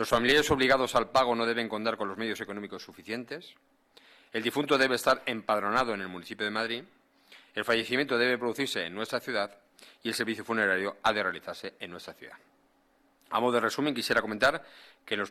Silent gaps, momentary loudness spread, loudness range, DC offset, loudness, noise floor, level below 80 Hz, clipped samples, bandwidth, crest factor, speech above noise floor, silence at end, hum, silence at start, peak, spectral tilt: none; 15 LU; 3 LU; under 0.1%; -29 LUFS; -67 dBFS; -60 dBFS; under 0.1%; 17 kHz; 18 dB; 38 dB; 0 s; none; 0 s; -12 dBFS; -3.5 dB/octave